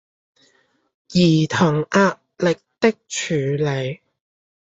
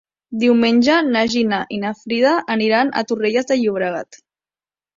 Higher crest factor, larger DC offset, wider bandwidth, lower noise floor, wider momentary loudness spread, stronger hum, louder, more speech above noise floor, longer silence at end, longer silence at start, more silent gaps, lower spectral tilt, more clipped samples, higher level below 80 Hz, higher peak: about the same, 18 dB vs 16 dB; neither; about the same, 8 kHz vs 7.6 kHz; second, -62 dBFS vs under -90 dBFS; about the same, 9 LU vs 10 LU; neither; second, -20 LUFS vs -17 LUFS; second, 43 dB vs over 73 dB; about the same, 0.8 s vs 0.9 s; first, 1.1 s vs 0.3 s; neither; about the same, -5.5 dB/octave vs -4.5 dB/octave; neither; about the same, -58 dBFS vs -60 dBFS; about the same, -2 dBFS vs -2 dBFS